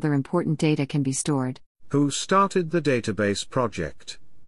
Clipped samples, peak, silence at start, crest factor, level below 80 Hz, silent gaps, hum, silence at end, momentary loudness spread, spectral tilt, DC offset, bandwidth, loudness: under 0.1%; -8 dBFS; 0 s; 16 dB; -54 dBFS; 1.66-1.75 s; none; 0 s; 12 LU; -5.5 dB/octave; under 0.1%; 12 kHz; -24 LUFS